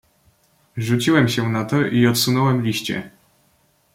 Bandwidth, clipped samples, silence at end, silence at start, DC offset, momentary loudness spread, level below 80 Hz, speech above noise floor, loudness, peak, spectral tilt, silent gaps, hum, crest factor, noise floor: 16.5 kHz; under 0.1%; 0.85 s; 0.75 s; under 0.1%; 11 LU; -56 dBFS; 43 dB; -19 LUFS; -4 dBFS; -5 dB/octave; none; none; 18 dB; -61 dBFS